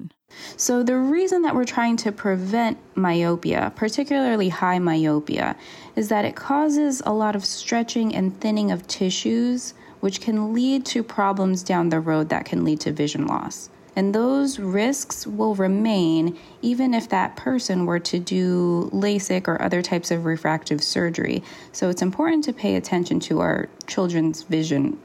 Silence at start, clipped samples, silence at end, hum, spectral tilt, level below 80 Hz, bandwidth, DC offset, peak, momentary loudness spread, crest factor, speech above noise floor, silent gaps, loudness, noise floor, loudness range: 0 s; under 0.1%; 0.05 s; none; -5 dB/octave; -60 dBFS; 15 kHz; under 0.1%; -8 dBFS; 6 LU; 14 dB; 20 dB; none; -22 LUFS; -42 dBFS; 1 LU